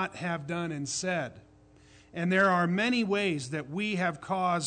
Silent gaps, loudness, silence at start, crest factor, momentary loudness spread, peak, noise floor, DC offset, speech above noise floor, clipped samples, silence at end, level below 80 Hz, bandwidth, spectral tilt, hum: none; -29 LUFS; 0 s; 16 dB; 10 LU; -14 dBFS; -58 dBFS; under 0.1%; 28 dB; under 0.1%; 0 s; -66 dBFS; 9.4 kHz; -4.5 dB/octave; none